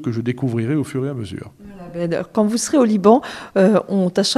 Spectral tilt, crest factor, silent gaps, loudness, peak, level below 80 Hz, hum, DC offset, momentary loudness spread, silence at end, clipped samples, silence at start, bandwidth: -5.5 dB/octave; 18 dB; none; -18 LUFS; 0 dBFS; -56 dBFS; none; under 0.1%; 17 LU; 0 s; under 0.1%; 0 s; 13.5 kHz